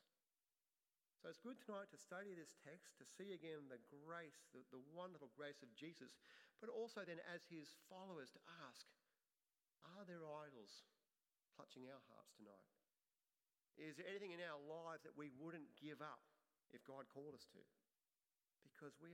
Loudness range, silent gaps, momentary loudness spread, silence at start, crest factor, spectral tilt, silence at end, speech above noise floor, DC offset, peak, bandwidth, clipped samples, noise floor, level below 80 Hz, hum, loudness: 6 LU; none; 12 LU; 1.25 s; 20 dB; -4.5 dB/octave; 0 s; over 32 dB; under 0.1%; -40 dBFS; 15.5 kHz; under 0.1%; under -90 dBFS; under -90 dBFS; none; -58 LUFS